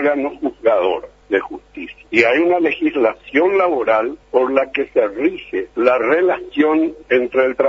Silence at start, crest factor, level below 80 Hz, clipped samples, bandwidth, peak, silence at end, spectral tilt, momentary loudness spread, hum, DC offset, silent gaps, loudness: 0 s; 16 dB; -54 dBFS; under 0.1%; 7.6 kHz; 0 dBFS; 0 s; -6 dB/octave; 8 LU; none; under 0.1%; none; -17 LUFS